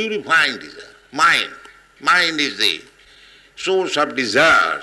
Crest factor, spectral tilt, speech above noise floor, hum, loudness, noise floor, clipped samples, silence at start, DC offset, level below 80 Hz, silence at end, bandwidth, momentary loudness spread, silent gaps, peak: 16 dB; -2 dB/octave; 30 dB; none; -16 LUFS; -48 dBFS; under 0.1%; 0 s; under 0.1%; -58 dBFS; 0 s; 12 kHz; 15 LU; none; -4 dBFS